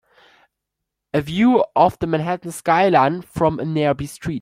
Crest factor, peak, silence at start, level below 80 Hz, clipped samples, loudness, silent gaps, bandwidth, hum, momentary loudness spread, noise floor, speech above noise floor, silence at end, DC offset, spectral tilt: 18 dB; -2 dBFS; 1.15 s; -48 dBFS; under 0.1%; -19 LUFS; none; 16 kHz; none; 9 LU; -81 dBFS; 63 dB; 0 s; under 0.1%; -6.5 dB/octave